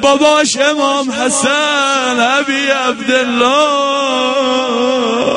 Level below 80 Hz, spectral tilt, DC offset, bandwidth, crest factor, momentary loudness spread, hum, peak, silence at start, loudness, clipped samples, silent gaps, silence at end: -54 dBFS; -1.5 dB/octave; under 0.1%; 11 kHz; 12 dB; 3 LU; none; 0 dBFS; 0 s; -12 LUFS; under 0.1%; none; 0 s